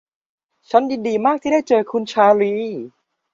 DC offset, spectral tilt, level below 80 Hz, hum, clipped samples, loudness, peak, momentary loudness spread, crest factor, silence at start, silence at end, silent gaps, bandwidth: under 0.1%; -5.5 dB/octave; -64 dBFS; none; under 0.1%; -18 LUFS; -2 dBFS; 12 LU; 16 dB; 0.7 s; 0.45 s; none; 7.6 kHz